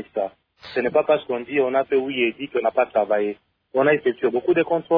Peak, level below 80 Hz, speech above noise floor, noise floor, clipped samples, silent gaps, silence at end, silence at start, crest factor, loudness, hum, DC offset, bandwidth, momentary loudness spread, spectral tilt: -6 dBFS; -66 dBFS; 21 dB; -41 dBFS; under 0.1%; none; 0 s; 0 s; 16 dB; -22 LUFS; none; under 0.1%; 5.2 kHz; 9 LU; -8.5 dB/octave